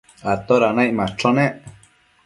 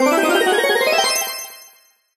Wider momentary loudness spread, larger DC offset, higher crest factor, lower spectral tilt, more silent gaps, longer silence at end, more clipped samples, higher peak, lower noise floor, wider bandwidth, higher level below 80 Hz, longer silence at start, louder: second, 8 LU vs 12 LU; neither; about the same, 18 dB vs 14 dB; first, -6.5 dB/octave vs -0.5 dB/octave; neither; about the same, 0.55 s vs 0.55 s; neither; about the same, -2 dBFS vs -4 dBFS; about the same, -54 dBFS vs -52 dBFS; second, 11.5 kHz vs 15 kHz; first, -52 dBFS vs -64 dBFS; first, 0.25 s vs 0 s; second, -19 LUFS vs -16 LUFS